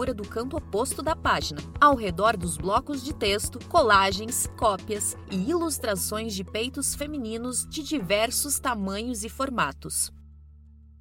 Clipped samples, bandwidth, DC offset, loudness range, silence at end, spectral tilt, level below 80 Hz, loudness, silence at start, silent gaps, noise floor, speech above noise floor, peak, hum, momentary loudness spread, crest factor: under 0.1%; 17 kHz; under 0.1%; 4 LU; 0.25 s; -3 dB/octave; -44 dBFS; -26 LUFS; 0 s; none; -50 dBFS; 24 dB; -6 dBFS; none; 10 LU; 22 dB